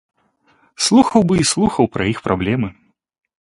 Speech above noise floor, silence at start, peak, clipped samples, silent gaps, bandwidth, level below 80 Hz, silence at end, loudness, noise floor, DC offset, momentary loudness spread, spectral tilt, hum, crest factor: 43 dB; 0.8 s; 0 dBFS; under 0.1%; none; 11.5 kHz; -44 dBFS; 0.7 s; -16 LUFS; -58 dBFS; under 0.1%; 8 LU; -4.5 dB/octave; none; 18 dB